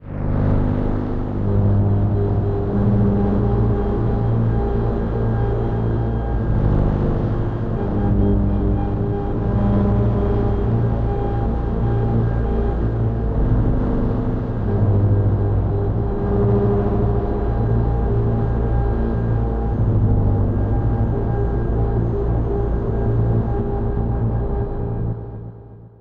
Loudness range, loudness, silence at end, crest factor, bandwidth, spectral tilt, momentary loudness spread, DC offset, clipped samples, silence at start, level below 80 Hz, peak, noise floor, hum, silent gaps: 2 LU; -20 LUFS; 0.1 s; 12 dB; 4.1 kHz; -11.5 dB/octave; 5 LU; under 0.1%; under 0.1%; 0 s; -24 dBFS; -8 dBFS; -39 dBFS; none; none